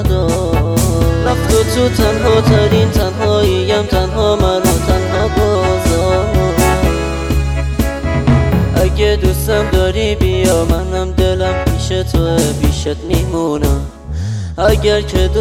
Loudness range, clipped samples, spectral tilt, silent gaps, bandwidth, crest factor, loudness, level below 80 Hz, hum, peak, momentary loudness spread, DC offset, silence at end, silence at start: 3 LU; under 0.1%; -5.5 dB/octave; none; 17.5 kHz; 12 dB; -14 LUFS; -18 dBFS; none; -2 dBFS; 5 LU; under 0.1%; 0 s; 0 s